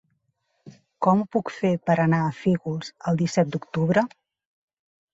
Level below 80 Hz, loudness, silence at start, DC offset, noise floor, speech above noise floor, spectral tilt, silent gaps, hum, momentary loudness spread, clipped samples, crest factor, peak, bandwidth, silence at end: -62 dBFS; -24 LUFS; 0.65 s; under 0.1%; -73 dBFS; 50 dB; -7 dB/octave; none; none; 7 LU; under 0.1%; 20 dB; -4 dBFS; 8 kHz; 1.05 s